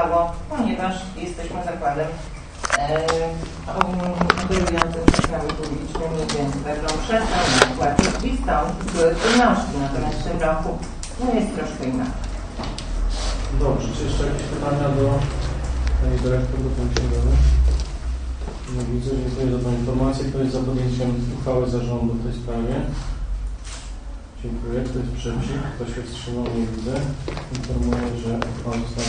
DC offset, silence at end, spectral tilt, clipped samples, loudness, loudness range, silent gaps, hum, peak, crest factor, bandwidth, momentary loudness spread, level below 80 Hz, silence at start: under 0.1%; 0 s; -5.5 dB/octave; under 0.1%; -23 LUFS; 7 LU; none; none; 0 dBFS; 22 dB; 10 kHz; 12 LU; -26 dBFS; 0 s